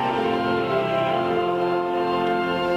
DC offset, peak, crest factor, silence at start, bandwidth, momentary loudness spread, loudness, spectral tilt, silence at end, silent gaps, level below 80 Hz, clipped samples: under 0.1%; -10 dBFS; 12 dB; 0 s; 11 kHz; 1 LU; -23 LUFS; -6.5 dB/octave; 0 s; none; -56 dBFS; under 0.1%